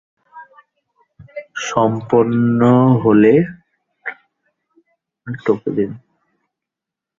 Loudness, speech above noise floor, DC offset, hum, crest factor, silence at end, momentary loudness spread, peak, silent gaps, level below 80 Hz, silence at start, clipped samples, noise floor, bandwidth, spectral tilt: -15 LUFS; 71 dB; under 0.1%; none; 16 dB; 1.25 s; 20 LU; -2 dBFS; none; -56 dBFS; 0.35 s; under 0.1%; -85 dBFS; 7.6 kHz; -7.5 dB/octave